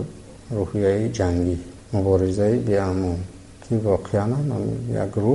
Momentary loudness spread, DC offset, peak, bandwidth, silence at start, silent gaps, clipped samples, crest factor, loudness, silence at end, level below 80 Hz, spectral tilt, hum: 11 LU; under 0.1%; -6 dBFS; 11.5 kHz; 0 s; none; under 0.1%; 16 dB; -23 LUFS; 0 s; -44 dBFS; -8 dB/octave; none